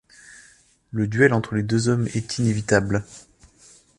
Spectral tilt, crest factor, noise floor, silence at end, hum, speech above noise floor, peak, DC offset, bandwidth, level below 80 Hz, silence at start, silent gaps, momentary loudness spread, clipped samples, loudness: -6 dB/octave; 20 dB; -55 dBFS; 0.8 s; none; 34 dB; -2 dBFS; under 0.1%; 11.5 kHz; -50 dBFS; 0.95 s; none; 9 LU; under 0.1%; -22 LUFS